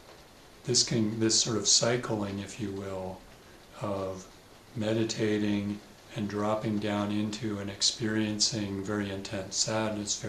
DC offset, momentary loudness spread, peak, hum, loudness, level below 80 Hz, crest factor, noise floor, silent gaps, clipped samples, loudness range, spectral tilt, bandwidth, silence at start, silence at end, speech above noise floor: under 0.1%; 14 LU; -10 dBFS; none; -29 LUFS; -60 dBFS; 20 dB; -53 dBFS; none; under 0.1%; 6 LU; -3.5 dB/octave; 14 kHz; 0 s; 0 s; 23 dB